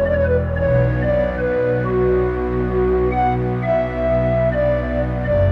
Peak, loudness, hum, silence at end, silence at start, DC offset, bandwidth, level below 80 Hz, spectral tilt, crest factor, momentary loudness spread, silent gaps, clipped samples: -6 dBFS; -18 LUFS; none; 0 s; 0 s; under 0.1%; 5.4 kHz; -28 dBFS; -10 dB/octave; 12 dB; 3 LU; none; under 0.1%